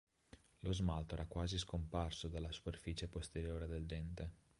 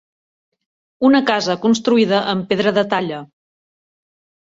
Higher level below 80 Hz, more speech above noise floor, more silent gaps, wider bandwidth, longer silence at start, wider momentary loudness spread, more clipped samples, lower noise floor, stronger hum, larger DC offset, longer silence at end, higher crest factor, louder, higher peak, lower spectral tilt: first, -50 dBFS vs -62 dBFS; second, 23 dB vs over 74 dB; neither; first, 11.5 kHz vs 8 kHz; second, 0.35 s vs 1 s; about the same, 6 LU vs 6 LU; neither; second, -66 dBFS vs under -90 dBFS; neither; neither; second, 0.25 s vs 1.15 s; about the same, 18 dB vs 18 dB; second, -45 LUFS vs -16 LUFS; second, -26 dBFS vs -2 dBFS; about the same, -5.5 dB/octave vs -5 dB/octave